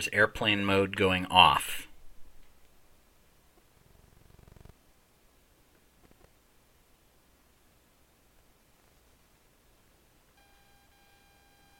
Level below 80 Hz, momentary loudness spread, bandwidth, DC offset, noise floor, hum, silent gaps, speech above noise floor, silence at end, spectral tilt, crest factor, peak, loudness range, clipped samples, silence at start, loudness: -58 dBFS; 17 LU; 16.5 kHz; under 0.1%; -64 dBFS; none; none; 39 dB; 9.35 s; -3.5 dB/octave; 32 dB; -2 dBFS; 14 LU; under 0.1%; 0 s; -25 LUFS